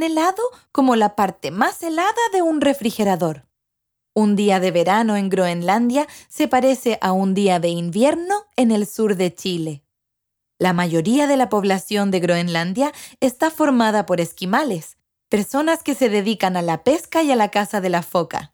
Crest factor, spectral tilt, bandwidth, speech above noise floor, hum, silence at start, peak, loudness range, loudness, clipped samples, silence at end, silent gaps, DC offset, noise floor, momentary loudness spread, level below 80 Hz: 18 dB; -5.5 dB/octave; over 20 kHz; 60 dB; none; 0 s; -2 dBFS; 2 LU; -19 LUFS; under 0.1%; 0.05 s; none; under 0.1%; -79 dBFS; 6 LU; -62 dBFS